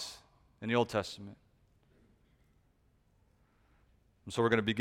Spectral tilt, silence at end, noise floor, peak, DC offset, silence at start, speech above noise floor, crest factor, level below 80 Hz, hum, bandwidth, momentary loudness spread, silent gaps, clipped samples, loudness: -5 dB/octave; 0 s; -70 dBFS; -12 dBFS; under 0.1%; 0 s; 38 dB; 24 dB; -66 dBFS; none; 15.5 kHz; 23 LU; none; under 0.1%; -33 LUFS